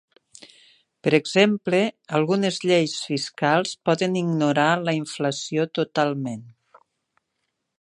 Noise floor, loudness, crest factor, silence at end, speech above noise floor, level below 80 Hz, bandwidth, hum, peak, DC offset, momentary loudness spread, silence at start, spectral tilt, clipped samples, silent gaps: -77 dBFS; -22 LUFS; 22 dB; 1.3 s; 55 dB; -72 dBFS; 11 kHz; none; -2 dBFS; under 0.1%; 7 LU; 0.4 s; -5 dB/octave; under 0.1%; none